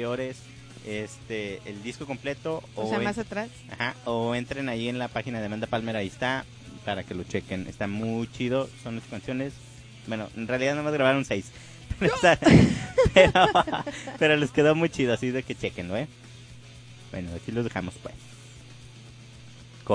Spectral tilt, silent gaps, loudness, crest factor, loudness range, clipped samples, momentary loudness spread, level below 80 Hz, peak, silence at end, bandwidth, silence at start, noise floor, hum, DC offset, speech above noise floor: -5.5 dB/octave; none; -26 LUFS; 24 dB; 13 LU; under 0.1%; 25 LU; -46 dBFS; -4 dBFS; 0 s; 10.5 kHz; 0 s; -47 dBFS; none; under 0.1%; 21 dB